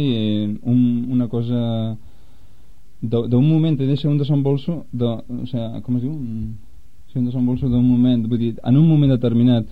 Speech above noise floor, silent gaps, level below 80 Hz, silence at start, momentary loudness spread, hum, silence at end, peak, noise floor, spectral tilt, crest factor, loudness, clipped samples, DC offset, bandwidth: 32 dB; none; -44 dBFS; 0 s; 12 LU; none; 0 s; -6 dBFS; -50 dBFS; -10.5 dB/octave; 14 dB; -19 LUFS; under 0.1%; 2%; 4.9 kHz